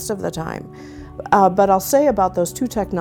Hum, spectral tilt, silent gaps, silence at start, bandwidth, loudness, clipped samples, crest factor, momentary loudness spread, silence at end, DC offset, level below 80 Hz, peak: none; -5.5 dB/octave; none; 0 s; 18 kHz; -18 LUFS; under 0.1%; 18 dB; 20 LU; 0 s; under 0.1%; -42 dBFS; 0 dBFS